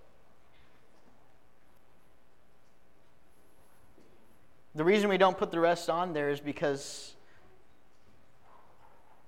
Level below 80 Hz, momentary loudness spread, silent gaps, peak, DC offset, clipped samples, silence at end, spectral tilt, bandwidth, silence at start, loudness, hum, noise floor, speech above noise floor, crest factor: -70 dBFS; 17 LU; none; -12 dBFS; 0.3%; under 0.1%; 2.2 s; -5 dB/octave; 16 kHz; 4.75 s; -29 LUFS; none; -66 dBFS; 37 dB; 22 dB